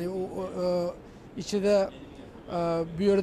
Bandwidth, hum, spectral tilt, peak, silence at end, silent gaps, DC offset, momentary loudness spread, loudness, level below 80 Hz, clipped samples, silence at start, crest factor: 13 kHz; none; -6.5 dB/octave; -12 dBFS; 0 s; none; under 0.1%; 20 LU; -29 LUFS; -54 dBFS; under 0.1%; 0 s; 16 dB